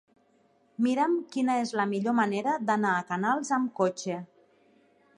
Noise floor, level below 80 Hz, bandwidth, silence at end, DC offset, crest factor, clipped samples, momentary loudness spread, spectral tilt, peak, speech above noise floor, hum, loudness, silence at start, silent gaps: -66 dBFS; -80 dBFS; 11 kHz; 0.95 s; under 0.1%; 18 dB; under 0.1%; 5 LU; -5.5 dB/octave; -12 dBFS; 38 dB; none; -28 LUFS; 0.8 s; none